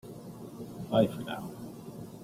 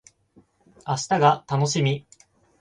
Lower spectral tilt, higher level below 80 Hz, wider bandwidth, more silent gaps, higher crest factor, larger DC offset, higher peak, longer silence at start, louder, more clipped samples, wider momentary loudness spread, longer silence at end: first, -7 dB/octave vs -5 dB/octave; about the same, -64 dBFS vs -62 dBFS; first, 16 kHz vs 10 kHz; neither; about the same, 24 dB vs 20 dB; neither; second, -12 dBFS vs -6 dBFS; second, 0.05 s vs 0.85 s; second, -32 LUFS vs -23 LUFS; neither; first, 17 LU vs 11 LU; second, 0 s vs 0.6 s